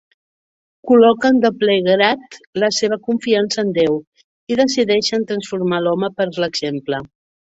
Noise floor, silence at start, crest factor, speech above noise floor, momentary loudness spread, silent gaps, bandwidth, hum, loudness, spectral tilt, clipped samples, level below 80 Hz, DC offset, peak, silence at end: under -90 dBFS; 0.85 s; 16 dB; over 74 dB; 11 LU; 2.47-2.53 s, 4.07-4.12 s, 4.24-4.47 s; 8 kHz; none; -17 LUFS; -4.5 dB/octave; under 0.1%; -60 dBFS; under 0.1%; -2 dBFS; 0.5 s